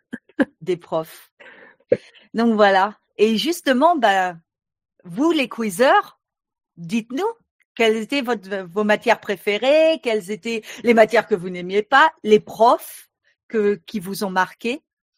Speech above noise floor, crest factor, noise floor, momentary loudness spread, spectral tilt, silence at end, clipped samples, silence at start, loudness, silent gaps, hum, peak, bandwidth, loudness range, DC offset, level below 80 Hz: 28 dB; 18 dB; -46 dBFS; 12 LU; -4.5 dB/octave; 0.4 s; under 0.1%; 0.15 s; -19 LUFS; 1.32-1.37 s, 7.51-7.59 s, 7.65-7.75 s, 13.43-13.49 s; none; -2 dBFS; 16 kHz; 4 LU; under 0.1%; -68 dBFS